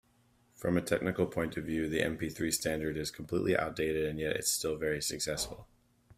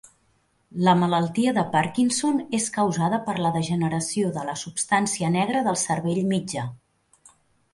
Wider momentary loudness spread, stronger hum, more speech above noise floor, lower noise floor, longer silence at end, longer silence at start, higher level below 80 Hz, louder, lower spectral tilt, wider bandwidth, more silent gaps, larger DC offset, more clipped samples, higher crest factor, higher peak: about the same, 5 LU vs 7 LU; neither; second, 35 dB vs 43 dB; about the same, -69 dBFS vs -66 dBFS; second, 0.05 s vs 1 s; about the same, 0.6 s vs 0.7 s; first, -56 dBFS vs -62 dBFS; second, -33 LUFS vs -23 LUFS; about the same, -4 dB/octave vs -5 dB/octave; first, 16 kHz vs 11.5 kHz; neither; neither; neither; about the same, 20 dB vs 20 dB; second, -14 dBFS vs -6 dBFS